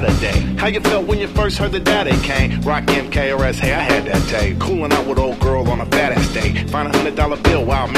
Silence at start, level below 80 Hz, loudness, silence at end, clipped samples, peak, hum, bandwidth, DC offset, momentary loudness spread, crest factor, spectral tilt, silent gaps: 0 s; -24 dBFS; -17 LUFS; 0 s; under 0.1%; 0 dBFS; none; 15.5 kHz; under 0.1%; 3 LU; 16 dB; -5.5 dB/octave; none